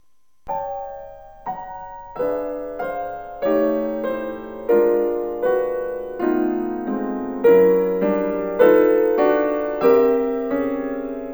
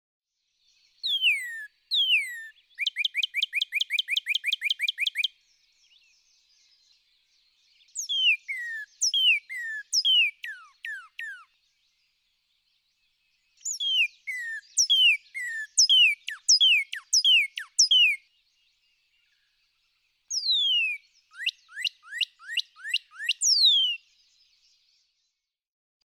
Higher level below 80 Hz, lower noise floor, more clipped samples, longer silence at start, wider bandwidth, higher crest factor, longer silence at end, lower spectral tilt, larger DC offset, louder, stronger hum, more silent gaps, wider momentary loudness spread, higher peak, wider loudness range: first, -50 dBFS vs -88 dBFS; second, -41 dBFS vs -81 dBFS; neither; second, 0.45 s vs 1.05 s; about the same, over 20 kHz vs 19.5 kHz; about the same, 18 dB vs 18 dB; second, 0 s vs 2.1 s; first, -9 dB/octave vs 11 dB/octave; first, 0.3% vs under 0.1%; first, -20 LUFS vs -23 LUFS; neither; neither; about the same, 16 LU vs 17 LU; first, -2 dBFS vs -10 dBFS; about the same, 9 LU vs 11 LU